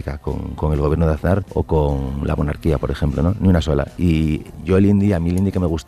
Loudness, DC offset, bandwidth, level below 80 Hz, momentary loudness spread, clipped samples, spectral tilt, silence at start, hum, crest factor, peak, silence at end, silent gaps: -19 LUFS; 0.5%; 13.5 kHz; -28 dBFS; 7 LU; under 0.1%; -8.5 dB/octave; 0 s; none; 14 dB; -4 dBFS; 0.05 s; none